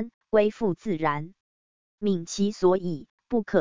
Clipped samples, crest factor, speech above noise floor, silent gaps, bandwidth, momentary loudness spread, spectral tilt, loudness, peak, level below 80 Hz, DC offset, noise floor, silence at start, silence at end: under 0.1%; 18 dB; over 65 dB; 0.14-0.21 s, 1.40-1.98 s, 3.10-3.18 s; 7.6 kHz; 11 LU; -6 dB/octave; -26 LUFS; -8 dBFS; -60 dBFS; 0.6%; under -90 dBFS; 0 s; 0 s